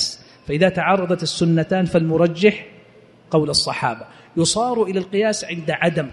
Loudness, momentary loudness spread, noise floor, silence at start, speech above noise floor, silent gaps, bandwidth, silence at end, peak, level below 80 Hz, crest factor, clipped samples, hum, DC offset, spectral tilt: -19 LUFS; 8 LU; -48 dBFS; 0 s; 30 dB; none; 11.5 kHz; 0 s; -2 dBFS; -52 dBFS; 18 dB; under 0.1%; none; under 0.1%; -4.5 dB/octave